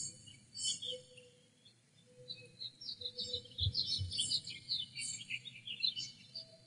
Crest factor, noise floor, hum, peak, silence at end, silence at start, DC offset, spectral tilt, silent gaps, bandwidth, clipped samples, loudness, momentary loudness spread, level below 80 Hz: 22 dB; -67 dBFS; none; -22 dBFS; 0 s; 0 s; under 0.1%; -1 dB/octave; none; 11 kHz; under 0.1%; -39 LUFS; 15 LU; -62 dBFS